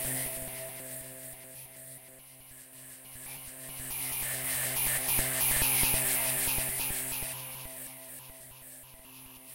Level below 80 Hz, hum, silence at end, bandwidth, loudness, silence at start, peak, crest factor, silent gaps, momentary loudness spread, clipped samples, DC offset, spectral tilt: -50 dBFS; none; 0 s; 16 kHz; -29 LUFS; 0 s; -14 dBFS; 20 dB; none; 23 LU; under 0.1%; under 0.1%; -1 dB/octave